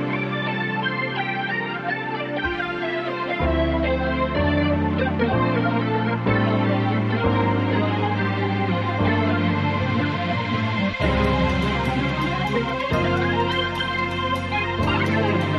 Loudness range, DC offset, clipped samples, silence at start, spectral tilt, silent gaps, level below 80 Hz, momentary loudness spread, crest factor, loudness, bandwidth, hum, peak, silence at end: 3 LU; under 0.1%; under 0.1%; 0 s; -7.5 dB/octave; none; -36 dBFS; 4 LU; 14 dB; -22 LUFS; 11 kHz; none; -8 dBFS; 0 s